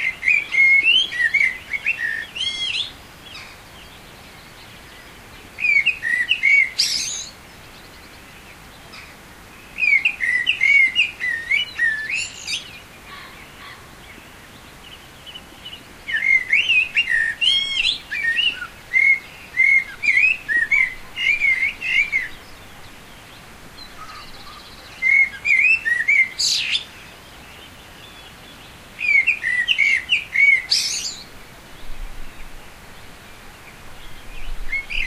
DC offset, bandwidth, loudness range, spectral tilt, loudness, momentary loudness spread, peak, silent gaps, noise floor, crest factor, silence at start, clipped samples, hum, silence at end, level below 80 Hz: under 0.1%; 16 kHz; 11 LU; 0.5 dB/octave; -17 LUFS; 24 LU; -4 dBFS; none; -42 dBFS; 18 dB; 0 s; under 0.1%; none; 0 s; -42 dBFS